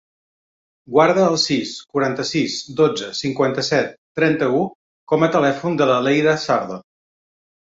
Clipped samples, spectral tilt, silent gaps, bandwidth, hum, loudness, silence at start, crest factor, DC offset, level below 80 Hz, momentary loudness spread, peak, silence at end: under 0.1%; -5 dB/octave; 3.98-4.15 s, 4.75-5.07 s; 8 kHz; none; -19 LUFS; 0.9 s; 18 dB; under 0.1%; -60 dBFS; 8 LU; -2 dBFS; 0.95 s